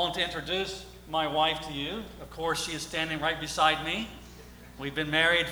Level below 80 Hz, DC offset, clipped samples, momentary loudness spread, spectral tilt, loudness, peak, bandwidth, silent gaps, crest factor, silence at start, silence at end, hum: -52 dBFS; under 0.1%; under 0.1%; 17 LU; -3 dB/octave; -29 LUFS; -8 dBFS; over 20 kHz; none; 22 dB; 0 s; 0 s; 60 Hz at -50 dBFS